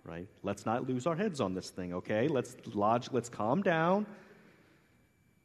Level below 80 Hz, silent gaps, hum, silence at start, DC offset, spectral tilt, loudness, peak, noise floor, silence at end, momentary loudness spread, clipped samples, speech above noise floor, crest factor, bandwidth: -72 dBFS; none; none; 0.05 s; under 0.1%; -6.5 dB/octave; -33 LUFS; -16 dBFS; -68 dBFS; 1.1 s; 10 LU; under 0.1%; 35 dB; 18 dB; 13 kHz